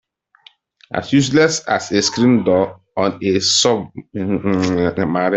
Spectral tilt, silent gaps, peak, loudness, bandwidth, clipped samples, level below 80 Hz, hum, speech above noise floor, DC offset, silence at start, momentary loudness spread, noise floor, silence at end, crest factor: -4 dB/octave; none; -2 dBFS; -16 LUFS; 8.4 kHz; under 0.1%; -52 dBFS; none; 34 dB; under 0.1%; 0.9 s; 9 LU; -50 dBFS; 0 s; 14 dB